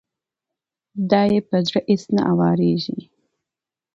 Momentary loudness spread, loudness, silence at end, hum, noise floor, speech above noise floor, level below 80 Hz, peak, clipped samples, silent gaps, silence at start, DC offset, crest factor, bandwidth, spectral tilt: 12 LU; -19 LUFS; 0.9 s; none; -88 dBFS; 70 dB; -60 dBFS; -2 dBFS; under 0.1%; none; 0.95 s; under 0.1%; 18 dB; 7.6 kHz; -7.5 dB/octave